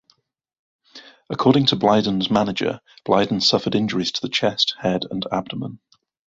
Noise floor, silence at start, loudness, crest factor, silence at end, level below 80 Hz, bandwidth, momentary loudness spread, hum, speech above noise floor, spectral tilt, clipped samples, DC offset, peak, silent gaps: -68 dBFS; 0.95 s; -20 LUFS; 20 dB; 0.55 s; -56 dBFS; 7.8 kHz; 12 LU; none; 48 dB; -5 dB/octave; under 0.1%; under 0.1%; -2 dBFS; none